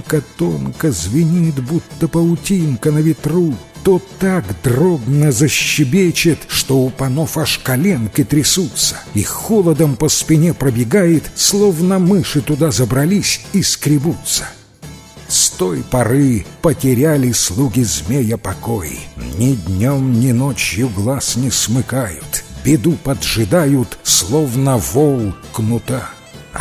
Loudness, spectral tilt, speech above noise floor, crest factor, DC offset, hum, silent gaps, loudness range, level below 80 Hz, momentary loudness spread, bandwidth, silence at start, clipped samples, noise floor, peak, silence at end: -15 LUFS; -4.5 dB/octave; 21 dB; 14 dB; under 0.1%; none; none; 3 LU; -36 dBFS; 7 LU; 16 kHz; 0 s; under 0.1%; -36 dBFS; 0 dBFS; 0 s